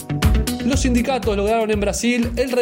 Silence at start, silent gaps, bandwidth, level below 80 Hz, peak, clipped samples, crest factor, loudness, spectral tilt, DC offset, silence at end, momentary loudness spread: 0 s; none; 16.5 kHz; -26 dBFS; -4 dBFS; under 0.1%; 14 dB; -19 LUFS; -5 dB/octave; under 0.1%; 0 s; 2 LU